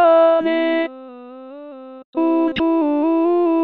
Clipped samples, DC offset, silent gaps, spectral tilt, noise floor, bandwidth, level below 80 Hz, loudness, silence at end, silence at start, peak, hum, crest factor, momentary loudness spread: under 0.1%; under 0.1%; 2.05-2.13 s; -8 dB/octave; -36 dBFS; 4.5 kHz; -56 dBFS; -17 LUFS; 0 s; 0 s; -4 dBFS; none; 14 dB; 23 LU